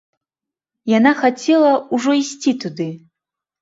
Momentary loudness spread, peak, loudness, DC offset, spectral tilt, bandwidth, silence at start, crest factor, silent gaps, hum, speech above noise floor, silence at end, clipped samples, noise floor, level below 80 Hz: 13 LU; 0 dBFS; -17 LUFS; under 0.1%; -5 dB/octave; 7.8 kHz; 0.85 s; 18 dB; none; none; 71 dB; 0.65 s; under 0.1%; -87 dBFS; -66 dBFS